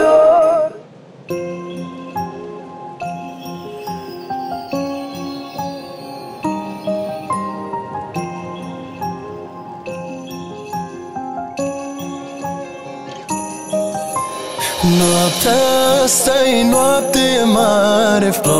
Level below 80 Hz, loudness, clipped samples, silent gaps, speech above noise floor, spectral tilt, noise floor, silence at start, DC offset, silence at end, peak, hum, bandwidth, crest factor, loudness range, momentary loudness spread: -48 dBFS; -17 LUFS; under 0.1%; none; 27 dB; -4 dB/octave; -40 dBFS; 0 s; under 0.1%; 0 s; -2 dBFS; none; 16 kHz; 16 dB; 15 LU; 17 LU